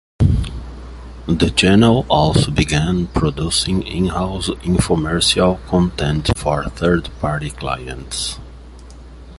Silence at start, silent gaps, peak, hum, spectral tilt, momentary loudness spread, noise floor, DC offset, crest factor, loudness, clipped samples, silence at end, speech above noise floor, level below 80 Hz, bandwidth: 0.2 s; none; 0 dBFS; none; -5 dB/octave; 12 LU; -37 dBFS; under 0.1%; 16 dB; -17 LUFS; under 0.1%; 0 s; 20 dB; -28 dBFS; 11.5 kHz